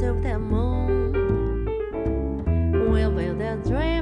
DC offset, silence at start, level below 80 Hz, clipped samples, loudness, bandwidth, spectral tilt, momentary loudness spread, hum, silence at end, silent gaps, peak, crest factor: under 0.1%; 0 s; -28 dBFS; under 0.1%; -24 LUFS; 5.6 kHz; -9 dB/octave; 5 LU; none; 0 s; none; -10 dBFS; 12 dB